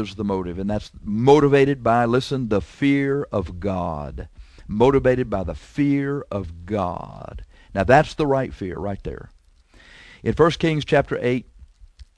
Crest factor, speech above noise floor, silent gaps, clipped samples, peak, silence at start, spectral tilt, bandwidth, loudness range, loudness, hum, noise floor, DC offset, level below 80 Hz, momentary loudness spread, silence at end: 20 dB; 32 dB; none; under 0.1%; -2 dBFS; 0 s; -7 dB/octave; 11 kHz; 4 LU; -21 LUFS; none; -52 dBFS; under 0.1%; -40 dBFS; 15 LU; 0.15 s